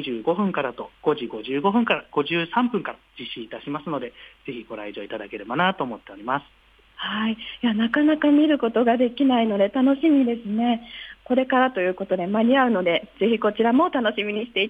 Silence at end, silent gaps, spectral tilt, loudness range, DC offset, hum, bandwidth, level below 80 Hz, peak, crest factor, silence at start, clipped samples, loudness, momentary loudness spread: 0 s; none; -8 dB/octave; 9 LU; under 0.1%; none; 4.9 kHz; -62 dBFS; -6 dBFS; 16 dB; 0 s; under 0.1%; -22 LUFS; 15 LU